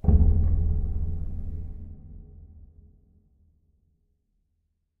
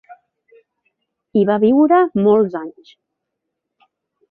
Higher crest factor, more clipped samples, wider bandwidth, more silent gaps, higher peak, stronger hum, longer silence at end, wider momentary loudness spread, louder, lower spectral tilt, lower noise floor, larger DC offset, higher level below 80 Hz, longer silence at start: about the same, 20 dB vs 16 dB; neither; second, 1.4 kHz vs 4.4 kHz; neither; second, -6 dBFS vs -2 dBFS; neither; first, 2.75 s vs 1.6 s; first, 26 LU vs 12 LU; second, -27 LUFS vs -15 LUFS; first, -13.5 dB/octave vs -10.5 dB/octave; about the same, -75 dBFS vs -78 dBFS; neither; first, -28 dBFS vs -62 dBFS; about the same, 0.05 s vs 0.1 s